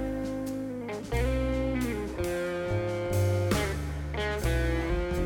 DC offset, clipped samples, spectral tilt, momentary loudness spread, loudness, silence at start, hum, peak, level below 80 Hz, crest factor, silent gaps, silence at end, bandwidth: under 0.1%; under 0.1%; -6 dB/octave; 7 LU; -30 LUFS; 0 s; none; -14 dBFS; -36 dBFS; 16 dB; none; 0 s; 19.5 kHz